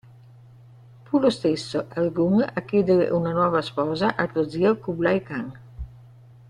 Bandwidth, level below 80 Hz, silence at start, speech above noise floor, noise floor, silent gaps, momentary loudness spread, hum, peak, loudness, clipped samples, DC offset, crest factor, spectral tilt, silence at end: 11 kHz; -50 dBFS; 1.1 s; 26 dB; -48 dBFS; none; 12 LU; none; -6 dBFS; -23 LUFS; under 0.1%; under 0.1%; 18 dB; -7 dB/octave; 0.55 s